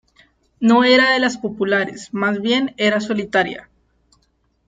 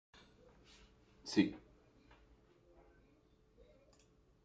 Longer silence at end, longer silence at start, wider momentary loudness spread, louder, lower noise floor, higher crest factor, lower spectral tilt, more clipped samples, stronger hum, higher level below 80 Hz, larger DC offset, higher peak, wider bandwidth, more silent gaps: second, 1.05 s vs 2.85 s; second, 0.6 s vs 1.25 s; second, 11 LU vs 29 LU; first, -17 LUFS vs -38 LUFS; second, -64 dBFS vs -70 dBFS; second, 16 dB vs 28 dB; about the same, -4.5 dB/octave vs -5.5 dB/octave; neither; neither; first, -58 dBFS vs -72 dBFS; neither; first, -2 dBFS vs -18 dBFS; about the same, 9.2 kHz vs 9 kHz; neither